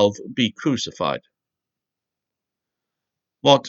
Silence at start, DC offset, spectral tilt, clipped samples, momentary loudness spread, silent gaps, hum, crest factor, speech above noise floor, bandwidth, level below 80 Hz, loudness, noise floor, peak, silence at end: 0 s; under 0.1%; -4.5 dB/octave; under 0.1%; 6 LU; none; none; 24 dB; 66 dB; 8 kHz; -66 dBFS; -23 LUFS; -86 dBFS; 0 dBFS; 0 s